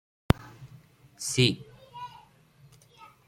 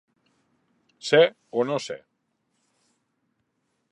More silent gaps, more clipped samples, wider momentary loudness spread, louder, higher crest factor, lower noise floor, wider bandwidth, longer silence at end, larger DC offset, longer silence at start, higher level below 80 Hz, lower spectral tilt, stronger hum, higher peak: neither; neither; first, 25 LU vs 17 LU; second, -27 LUFS vs -23 LUFS; first, 30 dB vs 24 dB; second, -58 dBFS vs -75 dBFS; first, 16.5 kHz vs 10.5 kHz; second, 1.2 s vs 1.95 s; neither; second, 0.35 s vs 1.05 s; first, -46 dBFS vs -82 dBFS; about the same, -4.5 dB/octave vs -4.5 dB/octave; neither; about the same, -2 dBFS vs -4 dBFS